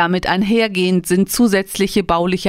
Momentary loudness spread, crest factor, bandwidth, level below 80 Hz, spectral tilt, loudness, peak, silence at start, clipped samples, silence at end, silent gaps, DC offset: 3 LU; 14 dB; 16 kHz; -40 dBFS; -5 dB/octave; -16 LUFS; -2 dBFS; 0 s; under 0.1%; 0 s; none; under 0.1%